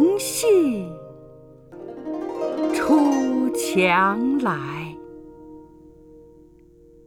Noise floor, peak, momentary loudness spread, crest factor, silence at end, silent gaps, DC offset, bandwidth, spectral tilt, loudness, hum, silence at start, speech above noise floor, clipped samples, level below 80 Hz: -50 dBFS; -6 dBFS; 23 LU; 16 dB; 1.45 s; none; under 0.1%; 19.5 kHz; -4.5 dB/octave; -21 LUFS; 50 Hz at -55 dBFS; 0 s; 31 dB; under 0.1%; -56 dBFS